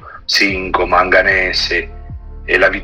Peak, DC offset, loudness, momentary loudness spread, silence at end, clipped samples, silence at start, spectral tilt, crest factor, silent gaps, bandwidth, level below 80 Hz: 0 dBFS; under 0.1%; -13 LUFS; 19 LU; 0 s; under 0.1%; 0 s; -3 dB/octave; 14 dB; none; 16 kHz; -32 dBFS